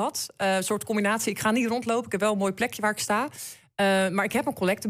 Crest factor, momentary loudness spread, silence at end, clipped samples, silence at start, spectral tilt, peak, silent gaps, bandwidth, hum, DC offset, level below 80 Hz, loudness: 14 dB; 4 LU; 0 s; under 0.1%; 0 s; -4 dB/octave; -12 dBFS; none; 16 kHz; none; under 0.1%; -66 dBFS; -26 LUFS